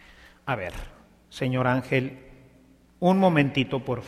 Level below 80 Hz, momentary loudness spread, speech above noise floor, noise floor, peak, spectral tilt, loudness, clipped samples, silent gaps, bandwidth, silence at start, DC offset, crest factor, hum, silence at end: -50 dBFS; 17 LU; 32 dB; -56 dBFS; -8 dBFS; -7.5 dB/octave; -25 LUFS; under 0.1%; none; 14 kHz; 0.45 s; under 0.1%; 20 dB; none; 0 s